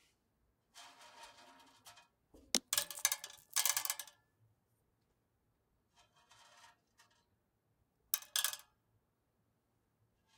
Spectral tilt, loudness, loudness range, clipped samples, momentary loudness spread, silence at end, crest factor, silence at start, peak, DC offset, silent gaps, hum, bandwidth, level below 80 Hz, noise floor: 1.5 dB/octave; -36 LUFS; 5 LU; under 0.1%; 23 LU; 1.75 s; 36 dB; 0.75 s; -10 dBFS; under 0.1%; none; none; 18 kHz; -82 dBFS; -81 dBFS